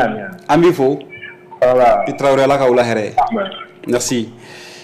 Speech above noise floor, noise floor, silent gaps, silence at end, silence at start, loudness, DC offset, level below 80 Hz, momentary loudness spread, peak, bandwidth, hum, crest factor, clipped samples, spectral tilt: 20 dB; -34 dBFS; none; 0 s; 0 s; -15 LUFS; under 0.1%; -46 dBFS; 19 LU; -6 dBFS; 15.5 kHz; none; 10 dB; under 0.1%; -5 dB/octave